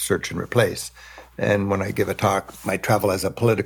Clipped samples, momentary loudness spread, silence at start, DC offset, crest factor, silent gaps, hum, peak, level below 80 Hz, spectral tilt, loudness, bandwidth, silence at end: under 0.1%; 10 LU; 0 s; under 0.1%; 18 dB; none; none; -4 dBFS; -52 dBFS; -5 dB/octave; -22 LUFS; 19 kHz; 0 s